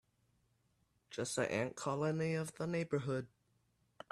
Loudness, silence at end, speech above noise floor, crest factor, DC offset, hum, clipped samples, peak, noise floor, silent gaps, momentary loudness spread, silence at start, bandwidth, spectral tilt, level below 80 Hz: -39 LUFS; 0.85 s; 40 dB; 18 dB; under 0.1%; none; under 0.1%; -22 dBFS; -78 dBFS; none; 10 LU; 1.1 s; 14 kHz; -5.5 dB/octave; -76 dBFS